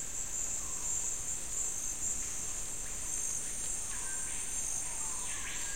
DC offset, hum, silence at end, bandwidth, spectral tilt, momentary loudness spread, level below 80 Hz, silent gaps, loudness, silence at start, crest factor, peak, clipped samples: 0.8%; none; 0 s; 16 kHz; -0.5 dB/octave; 3 LU; -50 dBFS; none; -35 LUFS; 0 s; 14 dB; -22 dBFS; under 0.1%